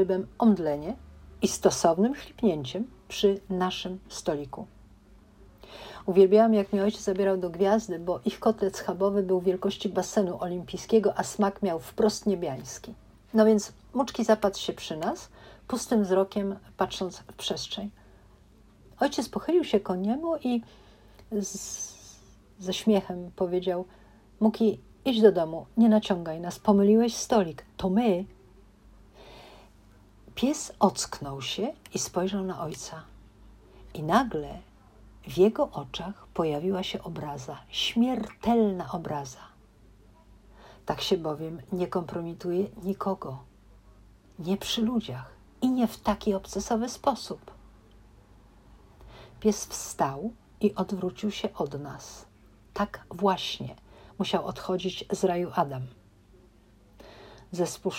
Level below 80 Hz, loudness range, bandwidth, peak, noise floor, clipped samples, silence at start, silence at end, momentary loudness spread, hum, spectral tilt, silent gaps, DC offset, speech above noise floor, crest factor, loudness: -56 dBFS; 8 LU; 16 kHz; -6 dBFS; -57 dBFS; under 0.1%; 0 s; 0 s; 16 LU; none; -5 dB/octave; none; under 0.1%; 30 dB; 22 dB; -28 LUFS